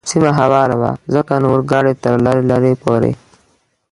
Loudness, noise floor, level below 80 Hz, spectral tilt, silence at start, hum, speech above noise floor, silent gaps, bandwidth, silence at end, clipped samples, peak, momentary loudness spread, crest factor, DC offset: -14 LUFS; -58 dBFS; -46 dBFS; -6.5 dB/octave; 0.05 s; none; 45 dB; none; 11.5 kHz; 0.8 s; under 0.1%; 0 dBFS; 5 LU; 14 dB; under 0.1%